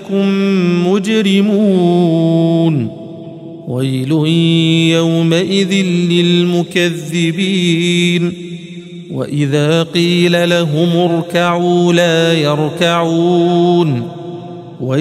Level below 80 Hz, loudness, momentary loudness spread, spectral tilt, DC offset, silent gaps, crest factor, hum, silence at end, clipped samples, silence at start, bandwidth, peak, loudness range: -60 dBFS; -13 LUFS; 14 LU; -6 dB/octave; under 0.1%; none; 12 dB; none; 0 s; under 0.1%; 0 s; 13 kHz; 0 dBFS; 2 LU